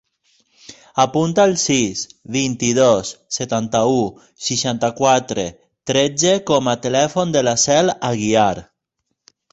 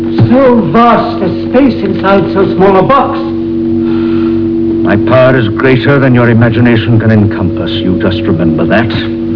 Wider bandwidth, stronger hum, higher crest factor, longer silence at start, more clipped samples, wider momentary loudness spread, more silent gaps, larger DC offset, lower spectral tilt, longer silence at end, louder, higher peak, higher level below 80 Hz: first, 8.2 kHz vs 5.4 kHz; neither; first, 16 dB vs 8 dB; first, 0.7 s vs 0 s; neither; first, 10 LU vs 6 LU; neither; second, under 0.1% vs 0.9%; second, -4 dB/octave vs -9.5 dB/octave; first, 0.9 s vs 0 s; second, -17 LUFS vs -8 LUFS; about the same, -2 dBFS vs 0 dBFS; second, -52 dBFS vs -34 dBFS